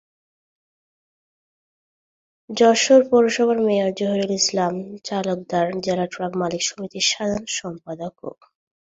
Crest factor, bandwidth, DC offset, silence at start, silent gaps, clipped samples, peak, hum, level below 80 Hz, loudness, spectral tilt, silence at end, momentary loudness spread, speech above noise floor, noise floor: 20 dB; 8 kHz; under 0.1%; 2.5 s; none; under 0.1%; -2 dBFS; none; -62 dBFS; -20 LUFS; -3.5 dB/octave; 0.6 s; 17 LU; over 70 dB; under -90 dBFS